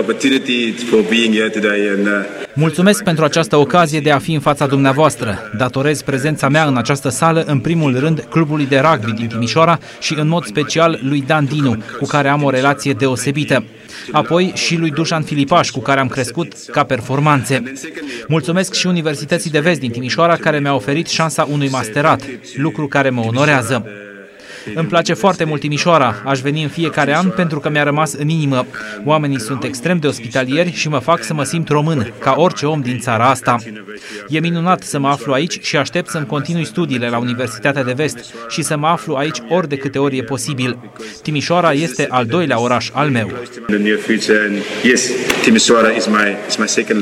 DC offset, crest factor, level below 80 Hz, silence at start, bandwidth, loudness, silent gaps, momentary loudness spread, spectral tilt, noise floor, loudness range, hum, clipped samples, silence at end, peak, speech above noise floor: under 0.1%; 16 dB; -54 dBFS; 0 s; 15 kHz; -15 LUFS; none; 7 LU; -5 dB/octave; -35 dBFS; 4 LU; none; under 0.1%; 0 s; 0 dBFS; 20 dB